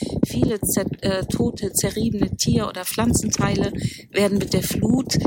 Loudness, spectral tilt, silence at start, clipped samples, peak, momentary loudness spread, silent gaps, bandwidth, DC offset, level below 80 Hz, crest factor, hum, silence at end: -22 LUFS; -4.5 dB/octave; 0 s; under 0.1%; -4 dBFS; 4 LU; none; 17 kHz; under 0.1%; -38 dBFS; 18 dB; none; 0 s